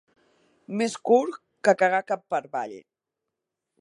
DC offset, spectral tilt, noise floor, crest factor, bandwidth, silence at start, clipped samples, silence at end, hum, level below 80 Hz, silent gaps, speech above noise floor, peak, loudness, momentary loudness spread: under 0.1%; -4.5 dB/octave; -85 dBFS; 22 dB; 11.5 kHz; 0.7 s; under 0.1%; 1 s; none; -82 dBFS; none; 61 dB; -6 dBFS; -25 LUFS; 13 LU